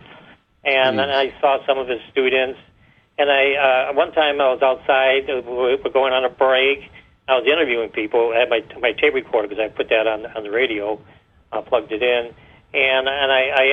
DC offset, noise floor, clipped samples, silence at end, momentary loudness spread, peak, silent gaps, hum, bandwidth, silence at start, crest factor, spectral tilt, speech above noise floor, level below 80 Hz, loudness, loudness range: under 0.1%; -48 dBFS; under 0.1%; 0 s; 9 LU; -2 dBFS; none; none; 5.4 kHz; 0.1 s; 18 dB; -5.5 dB/octave; 30 dB; -56 dBFS; -18 LUFS; 4 LU